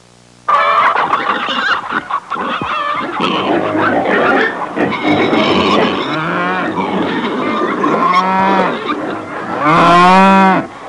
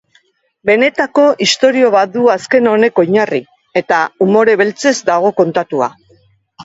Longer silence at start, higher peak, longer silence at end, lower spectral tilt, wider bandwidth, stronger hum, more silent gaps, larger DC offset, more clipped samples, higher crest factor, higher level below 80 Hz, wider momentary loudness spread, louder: second, 0.45 s vs 0.65 s; about the same, -2 dBFS vs 0 dBFS; about the same, 0 s vs 0 s; first, -5.5 dB/octave vs -4 dB/octave; first, 11 kHz vs 8 kHz; neither; neither; neither; neither; about the same, 12 dB vs 12 dB; first, -50 dBFS vs -58 dBFS; first, 11 LU vs 8 LU; about the same, -13 LUFS vs -12 LUFS